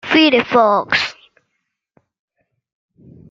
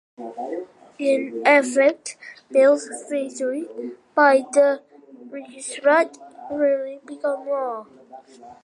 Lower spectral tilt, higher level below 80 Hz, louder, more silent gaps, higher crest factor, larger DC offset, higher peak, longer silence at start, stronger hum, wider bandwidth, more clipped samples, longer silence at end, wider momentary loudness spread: first, -4.5 dB/octave vs -2.5 dB/octave; first, -58 dBFS vs -76 dBFS; first, -14 LUFS vs -21 LUFS; neither; about the same, 18 dB vs 20 dB; neither; about the same, -2 dBFS vs -2 dBFS; second, 0.05 s vs 0.2 s; neither; second, 7.6 kHz vs 11.5 kHz; neither; first, 2.2 s vs 0.1 s; second, 6 LU vs 19 LU